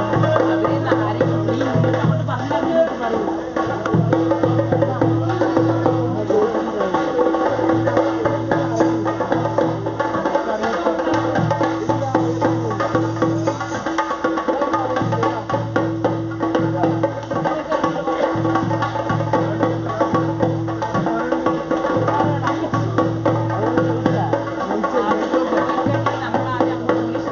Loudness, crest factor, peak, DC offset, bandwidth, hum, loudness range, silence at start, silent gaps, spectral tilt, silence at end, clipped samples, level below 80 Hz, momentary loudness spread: -19 LUFS; 18 dB; 0 dBFS; under 0.1%; 7.2 kHz; none; 2 LU; 0 s; none; -6.5 dB/octave; 0 s; under 0.1%; -48 dBFS; 4 LU